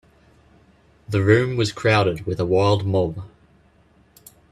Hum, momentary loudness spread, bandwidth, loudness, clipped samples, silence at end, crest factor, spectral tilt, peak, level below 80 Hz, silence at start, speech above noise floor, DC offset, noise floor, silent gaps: none; 8 LU; 13 kHz; -20 LUFS; under 0.1%; 1.25 s; 22 dB; -6.5 dB/octave; 0 dBFS; -50 dBFS; 1.1 s; 37 dB; under 0.1%; -56 dBFS; none